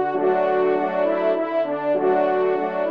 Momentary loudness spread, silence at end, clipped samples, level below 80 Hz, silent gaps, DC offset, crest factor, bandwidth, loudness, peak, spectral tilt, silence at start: 3 LU; 0 s; under 0.1%; -76 dBFS; none; 0.2%; 12 dB; 5.2 kHz; -21 LUFS; -8 dBFS; -8 dB/octave; 0 s